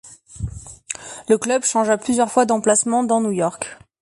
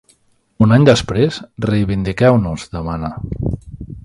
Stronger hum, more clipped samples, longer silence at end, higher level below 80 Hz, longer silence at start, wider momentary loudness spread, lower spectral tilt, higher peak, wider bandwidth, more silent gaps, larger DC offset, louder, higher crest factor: neither; neither; first, 0.25 s vs 0.05 s; second, -44 dBFS vs -34 dBFS; second, 0.05 s vs 0.6 s; about the same, 15 LU vs 14 LU; second, -4 dB/octave vs -7 dB/octave; second, -4 dBFS vs 0 dBFS; about the same, 11.5 kHz vs 11.5 kHz; neither; neither; about the same, -18 LUFS vs -16 LUFS; about the same, 16 dB vs 16 dB